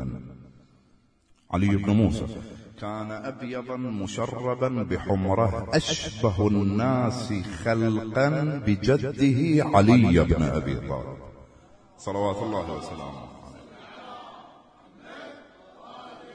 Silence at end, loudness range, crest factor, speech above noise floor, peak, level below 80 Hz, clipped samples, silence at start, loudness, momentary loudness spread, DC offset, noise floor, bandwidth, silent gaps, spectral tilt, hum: 0 s; 12 LU; 20 dB; 38 dB; -6 dBFS; -44 dBFS; under 0.1%; 0 s; -25 LUFS; 23 LU; under 0.1%; -62 dBFS; 10.5 kHz; none; -7 dB/octave; none